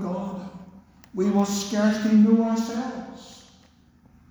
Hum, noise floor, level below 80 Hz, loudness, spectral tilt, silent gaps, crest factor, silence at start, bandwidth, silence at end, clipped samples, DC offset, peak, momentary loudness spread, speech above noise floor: none; -56 dBFS; -60 dBFS; -23 LUFS; -6 dB/octave; none; 16 dB; 0 s; over 20 kHz; 0.9 s; under 0.1%; under 0.1%; -8 dBFS; 20 LU; 34 dB